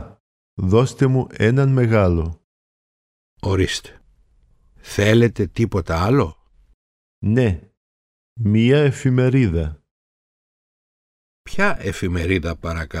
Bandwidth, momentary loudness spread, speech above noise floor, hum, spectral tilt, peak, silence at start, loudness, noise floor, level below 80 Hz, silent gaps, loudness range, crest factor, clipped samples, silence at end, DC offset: 13.5 kHz; 12 LU; 39 dB; none; -7 dB/octave; -2 dBFS; 0 s; -19 LUFS; -56 dBFS; -38 dBFS; 0.20-0.57 s, 2.44-3.37 s, 6.74-7.22 s, 7.77-8.36 s, 9.91-11.45 s; 5 LU; 18 dB; under 0.1%; 0 s; under 0.1%